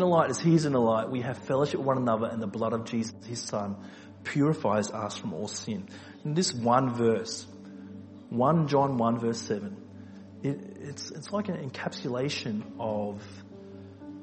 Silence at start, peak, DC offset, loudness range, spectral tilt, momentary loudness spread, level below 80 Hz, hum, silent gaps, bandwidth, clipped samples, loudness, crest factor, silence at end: 0 s; -10 dBFS; under 0.1%; 7 LU; -6 dB/octave; 21 LU; -70 dBFS; none; none; 8.4 kHz; under 0.1%; -29 LUFS; 20 dB; 0 s